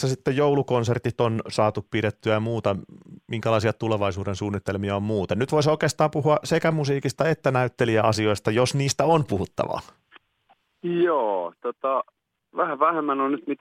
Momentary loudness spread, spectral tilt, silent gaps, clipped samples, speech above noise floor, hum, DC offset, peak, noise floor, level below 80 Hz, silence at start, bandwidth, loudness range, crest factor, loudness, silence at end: 8 LU; -6 dB/octave; none; under 0.1%; 41 dB; none; under 0.1%; -6 dBFS; -64 dBFS; -60 dBFS; 0 s; 15.5 kHz; 4 LU; 18 dB; -24 LUFS; 0.05 s